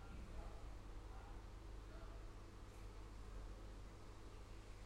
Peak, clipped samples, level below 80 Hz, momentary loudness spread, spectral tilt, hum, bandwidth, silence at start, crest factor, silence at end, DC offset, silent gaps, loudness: -40 dBFS; under 0.1%; -56 dBFS; 3 LU; -5.5 dB/octave; none; 14 kHz; 0 s; 14 dB; 0 s; under 0.1%; none; -58 LUFS